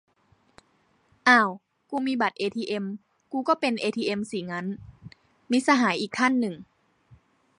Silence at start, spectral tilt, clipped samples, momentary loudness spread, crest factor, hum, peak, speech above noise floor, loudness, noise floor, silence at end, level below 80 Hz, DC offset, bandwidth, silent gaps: 1.25 s; -4.5 dB/octave; under 0.1%; 16 LU; 22 dB; none; -6 dBFS; 41 dB; -25 LUFS; -66 dBFS; 0.95 s; -66 dBFS; under 0.1%; 11 kHz; none